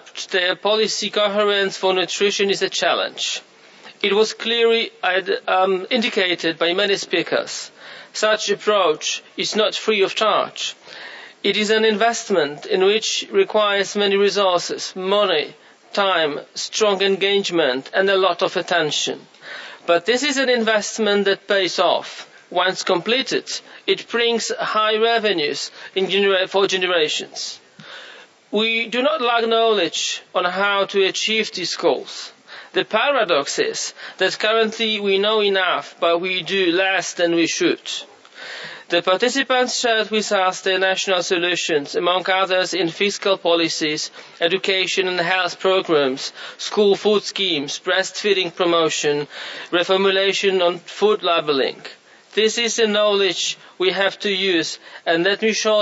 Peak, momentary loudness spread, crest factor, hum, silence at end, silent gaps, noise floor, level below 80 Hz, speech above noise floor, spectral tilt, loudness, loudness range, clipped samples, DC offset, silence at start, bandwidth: -4 dBFS; 9 LU; 16 dB; none; 0 s; none; -45 dBFS; -78 dBFS; 25 dB; -2.5 dB/octave; -19 LUFS; 2 LU; under 0.1%; under 0.1%; 0.05 s; 8 kHz